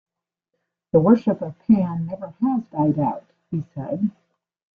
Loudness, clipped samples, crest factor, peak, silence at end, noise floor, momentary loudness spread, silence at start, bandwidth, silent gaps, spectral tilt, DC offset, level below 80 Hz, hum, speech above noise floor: -22 LUFS; under 0.1%; 20 dB; -2 dBFS; 0.7 s; -80 dBFS; 13 LU; 0.95 s; 4.9 kHz; none; -11.5 dB/octave; under 0.1%; -60 dBFS; none; 59 dB